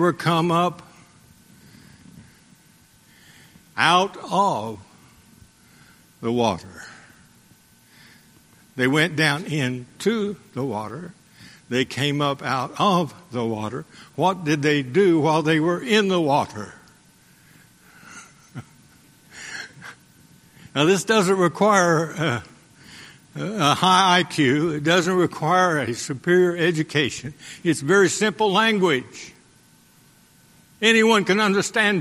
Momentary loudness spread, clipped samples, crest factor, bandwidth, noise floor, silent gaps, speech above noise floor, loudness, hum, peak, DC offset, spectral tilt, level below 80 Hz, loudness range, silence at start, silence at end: 21 LU; under 0.1%; 20 dB; 14 kHz; -55 dBFS; none; 34 dB; -20 LUFS; none; -2 dBFS; under 0.1%; -4.5 dB/octave; -62 dBFS; 11 LU; 0 s; 0 s